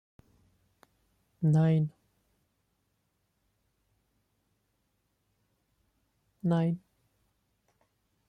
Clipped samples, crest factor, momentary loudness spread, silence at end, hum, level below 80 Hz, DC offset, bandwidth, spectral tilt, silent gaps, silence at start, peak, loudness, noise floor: under 0.1%; 18 dB; 11 LU; 1.5 s; none; -72 dBFS; under 0.1%; 8.4 kHz; -9.5 dB/octave; none; 1.4 s; -18 dBFS; -29 LUFS; -77 dBFS